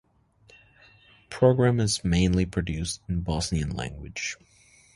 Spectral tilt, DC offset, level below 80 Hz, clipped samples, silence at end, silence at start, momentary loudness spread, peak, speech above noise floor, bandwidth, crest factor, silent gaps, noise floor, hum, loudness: -5.5 dB/octave; under 0.1%; -40 dBFS; under 0.1%; 0.6 s; 1.3 s; 12 LU; -6 dBFS; 35 dB; 11.5 kHz; 22 dB; none; -60 dBFS; none; -26 LUFS